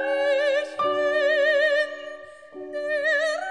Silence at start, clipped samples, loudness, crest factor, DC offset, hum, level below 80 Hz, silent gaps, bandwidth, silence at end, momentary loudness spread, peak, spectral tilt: 0 s; under 0.1%; -23 LUFS; 12 dB; 0.1%; none; -74 dBFS; none; 10 kHz; 0 s; 19 LU; -10 dBFS; -2 dB/octave